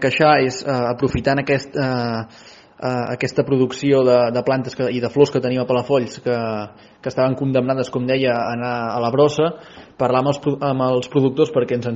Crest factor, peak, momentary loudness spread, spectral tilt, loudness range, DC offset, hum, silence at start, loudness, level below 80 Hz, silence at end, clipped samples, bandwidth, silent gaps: 18 dB; 0 dBFS; 8 LU; -5.5 dB/octave; 3 LU; under 0.1%; none; 0 s; -19 LUFS; -48 dBFS; 0 s; under 0.1%; 7.8 kHz; none